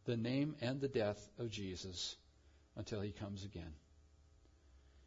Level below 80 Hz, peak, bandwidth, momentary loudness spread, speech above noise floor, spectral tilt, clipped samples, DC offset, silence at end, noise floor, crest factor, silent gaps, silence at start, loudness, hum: -66 dBFS; -26 dBFS; 7.4 kHz; 15 LU; 26 dB; -5.5 dB/octave; under 0.1%; under 0.1%; 0 s; -68 dBFS; 18 dB; none; 0.05 s; -43 LUFS; none